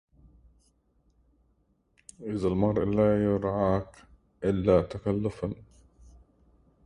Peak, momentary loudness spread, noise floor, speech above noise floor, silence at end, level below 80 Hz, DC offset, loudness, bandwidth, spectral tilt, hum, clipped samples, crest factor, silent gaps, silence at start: -8 dBFS; 13 LU; -69 dBFS; 43 dB; 1.25 s; -50 dBFS; under 0.1%; -27 LUFS; 11 kHz; -8.5 dB/octave; none; under 0.1%; 20 dB; none; 2.2 s